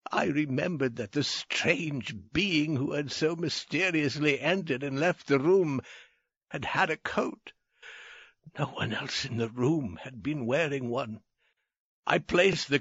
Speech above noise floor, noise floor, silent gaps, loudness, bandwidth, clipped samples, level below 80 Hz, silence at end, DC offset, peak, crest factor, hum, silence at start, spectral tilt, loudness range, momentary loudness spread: 47 dB; -76 dBFS; 6.37-6.41 s, 11.80-12.03 s; -29 LUFS; 8 kHz; under 0.1%; -60 dBFS; 0 s; under 0.1%; -8 dBFS; 20 dB; none; 0.1 s; -4 dB/octave; 5 LU; 14 LU